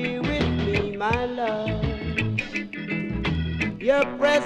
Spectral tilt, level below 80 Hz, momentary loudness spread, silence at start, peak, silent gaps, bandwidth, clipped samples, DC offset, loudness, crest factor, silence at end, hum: -6.5 dB/octave; -38 dBFS; 6 LU; 0 s; -6 dBFS; none; 11 kHz; under 0.1%; under 0.1%; -25 LUFS; 18 dB; 0 s; none